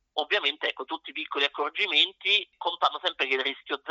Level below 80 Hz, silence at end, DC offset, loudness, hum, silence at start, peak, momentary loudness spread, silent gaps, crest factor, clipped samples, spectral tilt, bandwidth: -80 dBFS; 0 s; under 0.1%; -26 LUFS; none; 0.15 s; -8 dBFS; 11 LU; none; 20 dB; under 0.1%; 4.5 dB/octave; 7.6 kHz